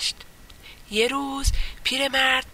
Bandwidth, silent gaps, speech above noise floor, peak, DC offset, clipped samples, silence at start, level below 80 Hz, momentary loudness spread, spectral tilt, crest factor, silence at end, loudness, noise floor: 16 kHz; none; 22 dB; -8 dBFS; under 0.1%; under 0.1%; 0 s; -32 dBFS; 8 LU; -2.5 dB/octave; 18 dB; 0 s; -23 LUFS; -45 dBFS